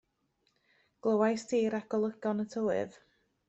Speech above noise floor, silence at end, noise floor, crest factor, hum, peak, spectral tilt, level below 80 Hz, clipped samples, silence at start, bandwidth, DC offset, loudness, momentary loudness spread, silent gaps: 46 dB; 0.55 s; -77 dBFS; 18 dB; none; -14 dBFS; -6 dB/octave; -74 dBFS; under 0.1%; 1.05 s; 8.2 kHz; under 0.1%; -32 LUFS; 7 LU; none